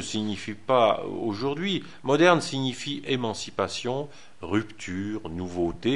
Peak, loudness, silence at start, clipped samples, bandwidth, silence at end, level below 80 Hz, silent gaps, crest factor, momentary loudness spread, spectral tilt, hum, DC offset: -6 dBFS; -27 LUFS; 0 s; under 0.1%; 11.5 kHz; 0 s; -54 dBFS; none; 22 dB; 13 LU; -5 dB/octave; none; 0.6%